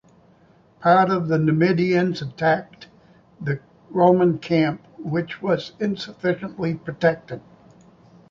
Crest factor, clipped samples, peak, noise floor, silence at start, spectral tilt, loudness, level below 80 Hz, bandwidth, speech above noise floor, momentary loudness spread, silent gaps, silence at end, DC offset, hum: 20 dB; under 0.1%; -2 dBFS; -55 dBFS; 0.8 s; -8 dB/octave; -21 LUFS; -60 dBFS; 7.2 kHz; 34 dB; 12 LU; none; 0.9 s; under 0.1%; none